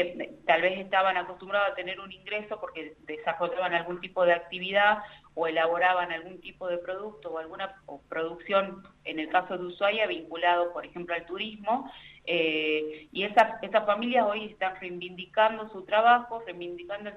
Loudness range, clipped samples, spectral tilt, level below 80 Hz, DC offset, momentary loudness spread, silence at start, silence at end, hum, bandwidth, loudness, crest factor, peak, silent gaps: 4 LU; under 0.1%; -5.5 dB/octave; -66 dBFS; under 0.1%; 14 LU; 0 s; 0 s; none; 7.6 kHz; -28 LUFS; 20 dB; -8 dBFS; none